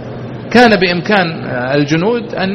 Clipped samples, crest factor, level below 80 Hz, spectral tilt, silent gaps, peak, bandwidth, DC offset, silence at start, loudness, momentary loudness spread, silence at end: 0.3%; 12 dB; -44 dBFS; -6 dB/octave; none; 0 dBFS; 11.5 kHz; under 0.1%; 0 s; -12 LUFS; 10 LU; 0 s